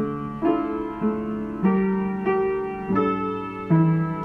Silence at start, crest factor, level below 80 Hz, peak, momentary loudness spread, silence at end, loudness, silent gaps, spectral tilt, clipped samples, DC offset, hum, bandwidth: 0 s; 14 dB; -50 dBFS; -8 dBFS; 8 LU; 0 s; -24 LUFS; none; -10.5 dB/octave; under 0.1%; under 0.1%; none; 4.3 kHz